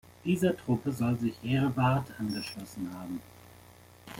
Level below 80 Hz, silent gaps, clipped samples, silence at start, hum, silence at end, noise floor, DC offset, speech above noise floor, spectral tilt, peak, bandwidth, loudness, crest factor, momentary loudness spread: -60 dBFS; none; under 0.1%; 0.1 s; 60 Hz at -50 dBFS; 0 s; -55 dBFS; under 0.1%; 24 dB; -7 dB/octave; -14 dBFS; 17 kHz; -31 LUFS; 18 dB; 12 LU